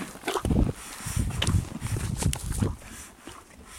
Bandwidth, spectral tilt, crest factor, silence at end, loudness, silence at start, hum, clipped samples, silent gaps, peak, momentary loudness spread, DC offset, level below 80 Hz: 16.5 kHz; -5 dB/octave; 22 dB; 0 s; -29 LUFS; 0 s; none; under 0.1%; none; -8 dBFS; 17 LU; under 0.1%; -36 dBFS